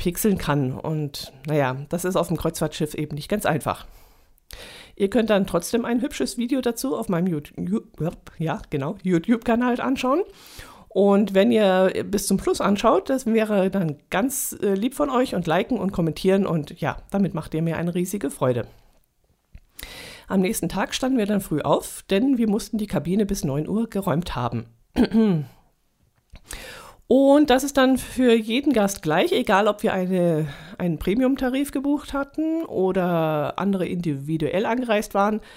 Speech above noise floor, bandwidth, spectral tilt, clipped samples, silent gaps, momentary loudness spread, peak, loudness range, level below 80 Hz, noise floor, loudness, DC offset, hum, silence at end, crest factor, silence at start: 43 dB; 16 kHz; -5.5 dB/octave; under 0.1%; none; 10 LU; -6 dBFS; 6 LU; -46 dBFS; -65 dBFS; -23 LUFS; under 0.1%; none; 0 s; 18 dB; 0 s